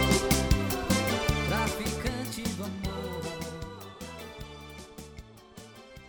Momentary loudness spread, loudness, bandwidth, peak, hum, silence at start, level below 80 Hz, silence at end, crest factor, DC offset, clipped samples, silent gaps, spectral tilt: 22 LU; -30 LUFS; over 20 kHz; -10 dBFS; none; 0 s; -38 dBFS; 0 s; 22 dB; under 0.1%; under 0.1%; none; -4.5 dB/octave